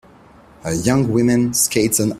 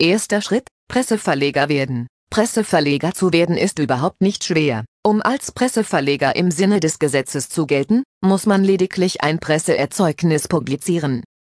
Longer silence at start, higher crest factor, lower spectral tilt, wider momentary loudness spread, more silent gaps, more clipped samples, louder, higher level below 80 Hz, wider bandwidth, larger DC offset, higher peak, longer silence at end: first, 0.65 s vs 0 s; about the same, 16 dB vs 16 dB; about the same, -4.5 dB/octave vs -5 dB/octave; first, 8 LU vs 5 LU; second, none vs 0.71-0.87 s, 2.09-2.27 s, 4.88-5.03 s, 8.05-8.21 s; neither; about the same, -16 LUFS vs -18 LUFS; first, -46 dBFS vs -54 dBFS; first, 16 kHz vs 11 kHz; neither; about the same, -2 dBFS vs -2 dBFS; second, 0 s vs 0.2 s